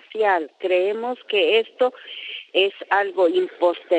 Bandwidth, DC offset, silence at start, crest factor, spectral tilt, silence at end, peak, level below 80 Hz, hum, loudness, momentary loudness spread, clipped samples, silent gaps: 8.8 kHz; under 0.1%; 0.15 s; 16 dB; -4 dB/octave; 0 s; -6 dBFS; -88 dBFS; none; -21 LUFS; 7 LU; under 0.1%; none